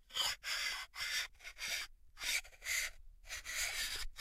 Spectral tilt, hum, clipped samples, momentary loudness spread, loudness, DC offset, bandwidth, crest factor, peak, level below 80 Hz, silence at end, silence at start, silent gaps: 2 dB/octave; none; under 0.1%; 8 LU; -39 LUFS; under 0.1%; 16 kHz; 18 dB; -24 dBFS; -56 dBFS; 0 s; 0.1 s; none